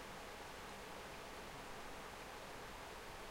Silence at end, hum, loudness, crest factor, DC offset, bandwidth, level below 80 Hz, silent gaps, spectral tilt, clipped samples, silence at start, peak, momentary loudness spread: 0 s; none; -51 LUFS; 12 dB; under 0.1%; 16 kHz; -62 dBFS; none; -3 dB/octave; under 0.1%; 0 s; -38 dBFS; 0 LU